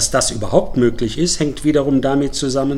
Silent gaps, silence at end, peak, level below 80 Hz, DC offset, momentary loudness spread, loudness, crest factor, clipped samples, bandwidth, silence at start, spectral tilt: none; 0 s; -2 dBFS; -34 dBFS; 0.4%; 3 LU; -17 LUFS; 16 dB; under 0.1%; 15.5 kHz; 0 s; -4.5 dB/octave